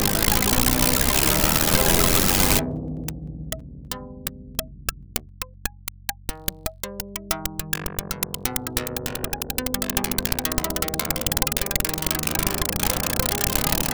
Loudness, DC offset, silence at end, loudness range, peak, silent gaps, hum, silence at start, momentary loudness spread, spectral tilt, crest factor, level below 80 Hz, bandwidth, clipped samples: -22 LUFS; under 0.1%; 0 s; 12 LU; -2 dBFS; none; none; 0 s; 15 LU; -3 dB/octave; 22 dB; -34 dBFS; over 20 kHz; under 0.1%